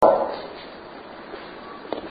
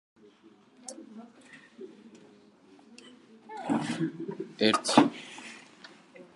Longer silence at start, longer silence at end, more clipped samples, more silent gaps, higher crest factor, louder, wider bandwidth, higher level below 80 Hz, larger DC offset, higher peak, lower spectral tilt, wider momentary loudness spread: second, 0 s vs 0.85 s; about the same, 0 s vs 0.1 s; neither; neither; second, 22 dB vs 28 dB; about the same, -29 LUFS vs -28 LUFS; second, 5 kHz vs 11.5 kHz; first, -58 dBFS vs -78 dBFS; neither; about the same, -4 dBFS vs -4 dBFS; first, -6.5 dB/octave vs -4 dB/octave; second, 16 LU vs 28 LU